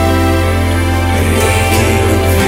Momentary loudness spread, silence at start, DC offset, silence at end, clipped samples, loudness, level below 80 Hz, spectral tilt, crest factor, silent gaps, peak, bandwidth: 2 LU; 0 s; under 0.1%; 0 s; under 0.1%; -12 LUFS; -22 dBFS; -5.5 dB/octave; 10 dB; none; 0 dBFS; 16.5 kHz